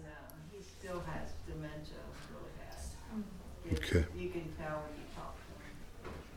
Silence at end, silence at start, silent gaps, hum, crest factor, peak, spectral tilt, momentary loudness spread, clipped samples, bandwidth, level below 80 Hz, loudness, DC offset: 0 s; 0 s; none; none; 26 dB; -16 dBFS; -6 dB/octave; 17 LU; under 0.1%; 17 kHz; -50 dBFS; -43 LUFS; under 0.1%